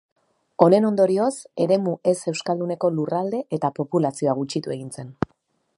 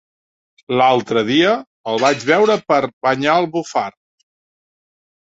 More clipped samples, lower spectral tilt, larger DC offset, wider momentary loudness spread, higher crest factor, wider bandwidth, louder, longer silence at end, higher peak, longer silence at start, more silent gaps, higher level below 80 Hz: neither; first, -6.5 dB/octave vs -4.5 dB/octave; neither; first, 14 LU vs 8 LU; about the same, 22 dB vs 18 dB; first, 11.5 kHz vs 8 kHz; second, -22 LUFS vs -16 LUFS; second, 0.65 s vs 1.5 s; about the same, 0 dBFS vs 0 dBFS; about the same, 0.6 s vs 0.7 s; second, none vs 1.67-1.84 s, 2.93-3.01 s; about the same, -60 dBFS vs -62 dBFS